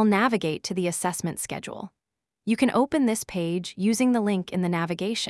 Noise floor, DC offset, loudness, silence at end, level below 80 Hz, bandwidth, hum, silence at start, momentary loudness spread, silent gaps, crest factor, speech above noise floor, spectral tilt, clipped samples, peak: -85 dBFS; under 0.1%; -25 LUFS; 0 s; -62 dBFS; 12 kHz; none; 0 s; 11 LU; none; 16 dB; 61 dB; -5 dB/octave; under 0.1%; -8 dBFS